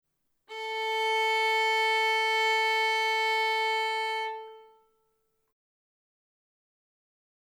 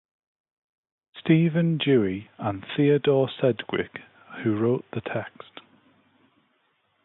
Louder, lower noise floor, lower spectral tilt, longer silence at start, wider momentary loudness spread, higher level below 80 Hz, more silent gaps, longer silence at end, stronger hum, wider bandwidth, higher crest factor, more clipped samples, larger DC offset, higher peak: about the same, -26 LUFS vs -25 LUFS; first, -75 dBFS vs -69 dBFS; second, 3 dB/octave vs -11.5 dB/octave; second, 0.5 s vs 1.15 s; second, 10 LU vs 17 LU; second, -88 dBFS vs -62 dBFS; neither; first, 2.95 s vs 1.75 s; neither; first, 18 kHz vs 4.1 kHz; second, 12 dB vs 18 dB; neither; neither; second, -18 dBFS vs -8 dBFS